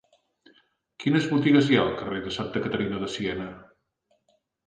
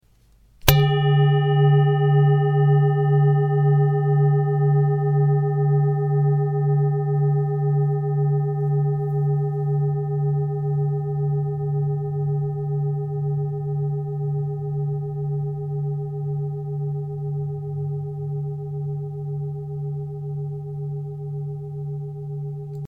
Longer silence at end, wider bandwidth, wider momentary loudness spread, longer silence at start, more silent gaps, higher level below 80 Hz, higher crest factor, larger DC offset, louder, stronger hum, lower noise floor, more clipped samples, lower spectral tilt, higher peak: first, 1.05 s vs 0 s; second, 9.2 kHz vs 16 kHz; about the same, 12 LU vs 12 LU; first, 1 s vs 0.65 s; neither; second, -56 dBFS vs -46 dBFS; about the same, 20 dB vs 22 dB; neither; second, -25 LUFS vs -22 LUFS; neither; first, -71 dBFS vs -56 dBFS; neither; second, -6.5 dB/octave vs -8 dB/octave; second, -6 dBFS vs 0 dBFS